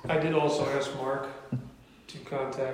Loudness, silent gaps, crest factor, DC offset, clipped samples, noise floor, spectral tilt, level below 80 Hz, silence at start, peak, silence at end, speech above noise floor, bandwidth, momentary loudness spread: -30 LUFS; none; 18 dB; under 0.1%; under 0.1%; -50 dBFS; -5.5 dB/octave; -62 dBFS; 0 s; -12 dBFS; 0 s; 20 dB; 15 kHz; 18 LU